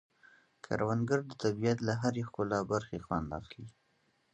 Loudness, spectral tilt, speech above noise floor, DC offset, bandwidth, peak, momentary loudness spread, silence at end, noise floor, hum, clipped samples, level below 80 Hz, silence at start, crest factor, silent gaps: -34 LUFS; -6.5 dB/octave; 40 dB; under 0.1%; 8.8 kHz; -16 dBFS; 12 LU; 0.65 s; -74 dBFS; none; under 0.1%; -58 dBFS; 0.7 s; 20 dB; none